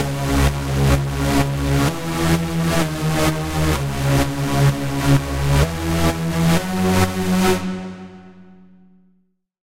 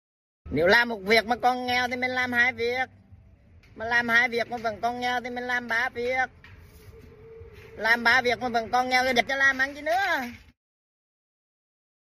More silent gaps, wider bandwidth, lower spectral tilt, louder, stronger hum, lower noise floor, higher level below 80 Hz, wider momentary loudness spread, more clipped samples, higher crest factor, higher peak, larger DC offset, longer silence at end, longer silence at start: neither; about the same, 16 kHz vs 15.5 kHz; first, -5.5 dB/octave vs -3.5 dB/octave; first, -19 LUFS vs -24 LUFS; neither; first, -63 dBFS vs -54 dBFS; first, -28 dBFS vs -56 dBFS; second, 3 LU vs 9 LU; neither; second, 14 dB vs 20 dB; about the same, -4 dBFS vs -6 dBFS; neither; second, 0.05 s vs 1.65 s; second, 0 s vs 0.45 s